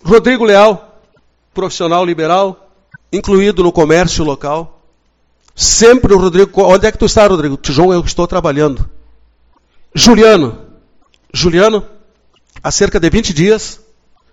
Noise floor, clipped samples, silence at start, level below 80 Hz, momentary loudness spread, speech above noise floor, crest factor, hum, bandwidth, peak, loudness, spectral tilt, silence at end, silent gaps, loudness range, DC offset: -56 dBFS; 1%; 0.05 s; -28 dBFS; 14 LU; 46 dB; 12 dB; none; 17.5 kHz; 0 dBFS; -10 LUFS; -4.5 dB/octave; 0.6 s; none; 4 LU; under 0.1%